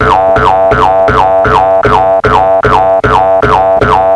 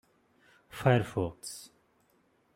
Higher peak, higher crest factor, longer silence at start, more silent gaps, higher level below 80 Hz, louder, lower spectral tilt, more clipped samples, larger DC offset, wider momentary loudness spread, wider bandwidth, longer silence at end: first, 0 dBFS vs -10 dBFS; second, 6 dB vs 24 dB; second, 0 s vs 0.75 s; neither; first, -24 dBFS vs -64 dBFS; first, -7 LUFS vs -31 LUFS; about the same, -6.5 dB/octave vs -6 dB/octave; first, 2% vs under 0.1%; first, 0.2% vs under 0.1%; second, 0 LU vs 19 LU; second, 11 kHz vs 16 kHz; second, 0 s vs 0.9 s